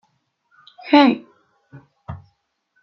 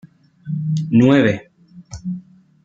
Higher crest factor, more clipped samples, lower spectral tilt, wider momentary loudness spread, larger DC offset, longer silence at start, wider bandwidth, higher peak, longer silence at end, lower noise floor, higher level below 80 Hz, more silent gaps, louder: about the same, 20 dB vs 18 dB; neither; about the same, -6.5 dB/octave vs -7.5 dB/octave; first, 25 LU vs 21 LU; neither; first, 0.85 s vs 0.45 s; second, 6 kHz vs 7.6 kHz; about the same, -2 dBFS vs -2 dBFS; first, 0.65 s vs 0.45 s; first, -68 dBFS vs -38 dBFS; second, -60 dBFS vs -52 dBFS; neither; about the same, -16 LUFS vs -17 LUFS